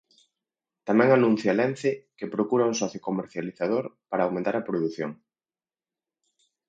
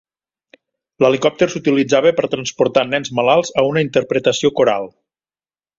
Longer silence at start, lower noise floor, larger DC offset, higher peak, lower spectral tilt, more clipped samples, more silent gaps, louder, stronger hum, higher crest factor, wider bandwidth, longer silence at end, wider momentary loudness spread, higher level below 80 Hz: second, 0.85 s vs 1 s; about the same, under -90 dBFS vs under -90 dBFS; neither; second, -6 dBFS vs 0 dBFS; first, -6 dB/octave vs -4.5 dB/octave; neither; neither; second, -26 LUFS vs -16 LUFS; neither; first, 22 dB vs 16 dB; first, 8.6 kHz vs 7.8 kHz; first, 1.55 s vs 0.9 s; first, 14 LU vs 5 LU; second, -72 dBFS vs -56 dBFS